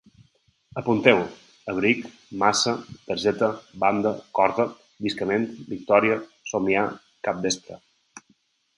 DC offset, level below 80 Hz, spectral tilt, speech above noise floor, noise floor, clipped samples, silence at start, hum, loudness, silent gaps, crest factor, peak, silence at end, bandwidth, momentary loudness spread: under 0.1%; -62 dBFS; -4 dB/octave; 42 dB; -65 dBFS; under 0.1%; 0.75 s; none; -24 LUFS; none; 24 dB; -2 dBFS; 0.6 s; 11.5 kHz; 12 LU